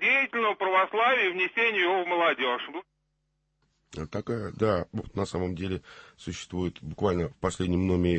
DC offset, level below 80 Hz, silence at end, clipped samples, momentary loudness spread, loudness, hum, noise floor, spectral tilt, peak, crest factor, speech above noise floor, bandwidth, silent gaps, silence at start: under 0.1%; -52 dBFS; 0 s; under 0.1%; 14 LU; -27 LUFS; none; -76 dBFS; -5.5 dB/octave; -12 dBFS; 16 dB; 49 dB; 8.8 kHz; none; 0 s